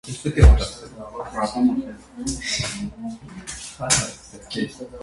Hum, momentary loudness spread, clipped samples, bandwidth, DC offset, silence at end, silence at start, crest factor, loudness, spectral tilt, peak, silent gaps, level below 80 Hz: none; 20 LU; under 0.1%; 11.5 kHz; under 0.1%; 0 s; 0.05 s; 22 dB; -22 LUFS; -4.5 dB/octave; 0 dBFS; none; -24 dBFS